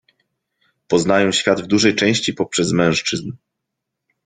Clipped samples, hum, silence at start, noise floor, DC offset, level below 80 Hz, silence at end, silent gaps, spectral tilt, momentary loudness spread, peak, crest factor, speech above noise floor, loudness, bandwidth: under 0.1%; none; 0.9 s; -79 dBFS; under 0.1%; -54 dBFS; 0.9 s; none; -4 dB/octave; 6 LU; -2 dBFS; 18 dB; 62 dB; -17 LUFS; 9.6 kHz